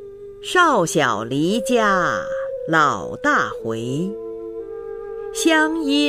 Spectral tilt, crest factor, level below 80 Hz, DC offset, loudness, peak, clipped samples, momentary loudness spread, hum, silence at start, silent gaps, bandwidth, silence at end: -4 dB/octave; 16 dB; -52 dBFS; under 0.1%; -19 LUFS; -4 dBFS; under 0.1%; 15 LU; none; 0 s; none; 15.5 kHz; 0 s